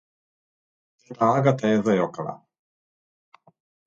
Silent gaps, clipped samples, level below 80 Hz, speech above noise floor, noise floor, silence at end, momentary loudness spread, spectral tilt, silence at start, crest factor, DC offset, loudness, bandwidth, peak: none; under 0.1%; -68 dBFS; over 68 dB; under -90 dBFS; 1.5 s; 13 LU; -7.5 dB/octave; 1.1 s; 20 dB; under 0.1%; -22 LUFS; 7.8 kHz; -6 dBFS